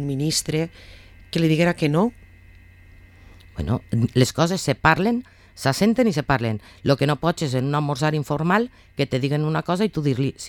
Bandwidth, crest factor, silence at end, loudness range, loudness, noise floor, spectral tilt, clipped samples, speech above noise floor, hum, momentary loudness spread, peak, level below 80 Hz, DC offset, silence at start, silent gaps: 18 kHz; 20 dB; 0 s; 3 LU; -22 LUFS; -47 dBFS; -5.5 dB/octave; under 0.1%; 26 dB; none; 8 LU; -2 dBFS; -46 dBFS; under 0.1%; 0 s; none